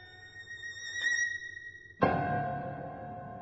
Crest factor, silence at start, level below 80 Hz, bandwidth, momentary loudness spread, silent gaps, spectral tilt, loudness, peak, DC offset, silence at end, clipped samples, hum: 24 dB; 0 s; -60 dBFS; 8 kHz; 16 LU; none; -4 dB/octave; -34 LUFS; -12 dBFS; under 0.1%; 0 s; under 0.1%; none